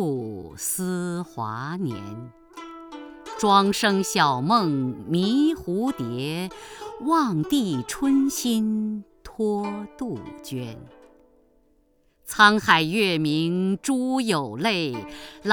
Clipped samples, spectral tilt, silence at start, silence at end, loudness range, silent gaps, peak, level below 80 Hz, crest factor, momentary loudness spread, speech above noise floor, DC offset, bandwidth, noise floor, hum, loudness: under 0.1%; -4.5 dB/octave; 0 s; 0 s; 9 LU; none; -2 dBFS; -56 dBFS; 22 dB; 20 LU; 40 dB; under 0.1%; over 20 kHz; -63 dBFS; none; -23 LUFS